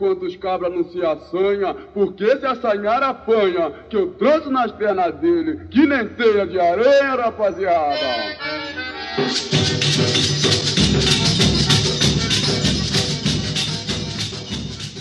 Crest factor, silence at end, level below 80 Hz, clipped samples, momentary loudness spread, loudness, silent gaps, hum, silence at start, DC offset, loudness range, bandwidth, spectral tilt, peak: 16 dB; 0 s; -38 dBFS; under 0.1%; 9 LU; -18 LUFS; none; none; 0 s; under 0.1%; 4 LU; 13 kHz; -4 dB/octave; -2 dBFS